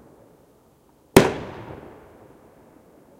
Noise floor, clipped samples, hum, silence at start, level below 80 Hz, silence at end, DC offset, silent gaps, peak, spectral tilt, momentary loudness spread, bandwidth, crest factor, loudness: -57 dBFS; under 0.1%; none; 1.15 s; -46 dBFS; 1.45 s; under 0.1%; none; 0 dBFS; -5 dB/octave; 25 LU; 16 kHz; 26 dB; -19 LUFS